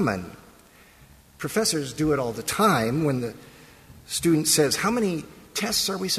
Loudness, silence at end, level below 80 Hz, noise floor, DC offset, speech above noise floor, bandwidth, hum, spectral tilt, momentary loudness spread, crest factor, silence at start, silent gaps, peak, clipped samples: -24 LUFS; 0 s; -52 dBFS; -53 dBFS; under 0.1%; 29 dB; 15.5 kHz; none; -3.5 dB/octave; 13 LU; 18 dB; 0 s; none; -8 dBFS; under 0.1%